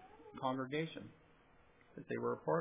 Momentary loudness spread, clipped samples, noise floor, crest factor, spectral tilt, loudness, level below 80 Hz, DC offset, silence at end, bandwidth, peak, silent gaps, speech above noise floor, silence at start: 18 LU; under 0.1%; -67 dBFS; 20 dB; -5 dB/octave; -42 LUFS; -76 dBFS; under 0.1%; 0 s; 3.8 kHz; -22 dBFS; none; 27 dB; 0 s